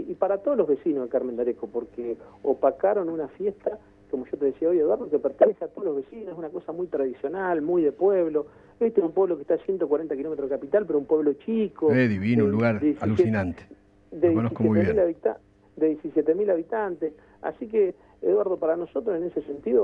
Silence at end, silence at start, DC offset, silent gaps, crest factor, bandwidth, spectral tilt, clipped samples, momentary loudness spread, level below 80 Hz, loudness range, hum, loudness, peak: 0 s; 0 s; under 0.1%; none; 20 dB; 5.2 kHz; -10 dB/octave; under 0.1%; 11 LU; -58 dBFS; 3 LU; none; -25 LUFS; -4 dBFS